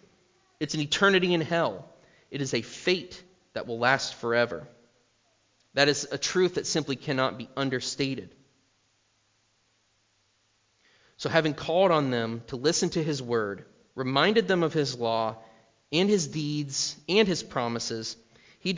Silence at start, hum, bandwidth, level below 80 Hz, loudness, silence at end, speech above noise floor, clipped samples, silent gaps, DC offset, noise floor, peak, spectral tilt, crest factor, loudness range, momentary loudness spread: 0.6 s; none; 7.8 kHz; -64 dBFS; -27 LUFS; 0 s; 43 dB; under 0.1%; none; under 0.1%; -70 dBFS; -6 dBFS; -4 dB/octave; 24 dB; 7 LU; 13 LU